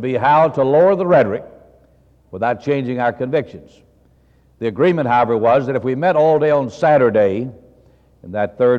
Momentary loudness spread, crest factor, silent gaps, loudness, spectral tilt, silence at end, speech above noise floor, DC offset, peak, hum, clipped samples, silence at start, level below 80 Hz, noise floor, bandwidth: 12 LU; 14 dB; none; -16 LUFS; -8 dB/octave; 0 s; 38 dB; under 0.1%; -4 dBFS; none; under 0.1%; 0 s; -56 dBFS; -53 dBFS; 7.6 kHz